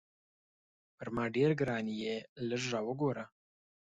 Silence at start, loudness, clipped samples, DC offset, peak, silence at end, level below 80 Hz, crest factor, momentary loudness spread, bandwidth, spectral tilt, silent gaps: 1 s; -35 LUFS; under 0.1%; under 0.1%; -18 dBFS; 0.6 s; -70 dBFS; 18 dB; 12 LU; 9.2 kHz; -6 dB/octave; 2.29-2.36 s